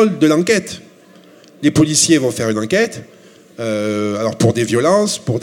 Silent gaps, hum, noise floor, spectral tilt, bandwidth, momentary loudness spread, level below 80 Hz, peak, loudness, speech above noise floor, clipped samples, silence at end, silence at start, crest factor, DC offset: none; none; -44 dBFS; -4.5 dB/octave; 16.5 kHz; 10 LU; -52 dBFS; 0 dBFS; -15 LUFS; 29 dB; under 0.1%; 0 s; 0 s; 16 dB; under 0.1%